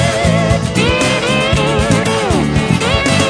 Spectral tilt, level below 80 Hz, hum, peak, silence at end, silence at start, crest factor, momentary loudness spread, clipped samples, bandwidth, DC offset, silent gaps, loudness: -5 dB/octave; -26 dBFS; none; 0 dBFS; 0 s; 0 s; 12 dB; 2 LU; under 0.1%; 11 kHz; under 0.1%; none; -13 LUFS